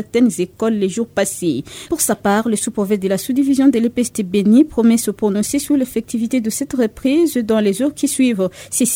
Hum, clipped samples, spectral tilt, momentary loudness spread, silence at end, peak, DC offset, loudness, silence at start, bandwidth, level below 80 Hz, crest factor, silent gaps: none; under 0.1%; -4.5 dB/octave; 7 LU; 0 s; -2 dBFS; under 0.1%; -17 LUFS; 0 s; 17 kHz; -50 dBFS; 14 dB; none